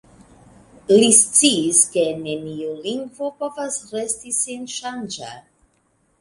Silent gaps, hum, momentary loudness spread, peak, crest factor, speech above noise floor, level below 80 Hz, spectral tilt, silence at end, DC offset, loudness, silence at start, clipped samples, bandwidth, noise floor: none; none; 18 LU; 0 dBFS; 22 dB; 44 dB; -62 dBFS; -2 dB/octave; 0.8 s; under 0.1%; -18 LUFS; 0.9 s; under 0.1%; 11.5 kHz; -64 dBFS